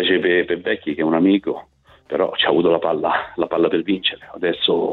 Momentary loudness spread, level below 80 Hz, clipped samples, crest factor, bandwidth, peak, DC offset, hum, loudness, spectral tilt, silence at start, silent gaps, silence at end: 7 LU; -56 dBFS; under 0.1%; 18 dB; 4.4 kHz; -2 dBFS; under 0.1%; none; -19 LUFS; -8 dB/octave; 0 s; none; 0 s